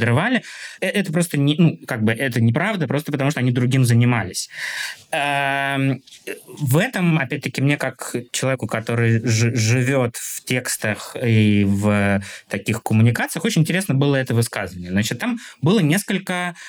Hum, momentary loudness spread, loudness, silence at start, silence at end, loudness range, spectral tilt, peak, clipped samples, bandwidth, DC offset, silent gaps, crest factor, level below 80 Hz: none; 9 LU; -20 LUFS; 0 s; 0 s; 2 LU; -5.5 dB/octave; -4 dBFS; under 0.1%; 19.5 kHz; under 0.1%; none; 16 dB; -64 dBFS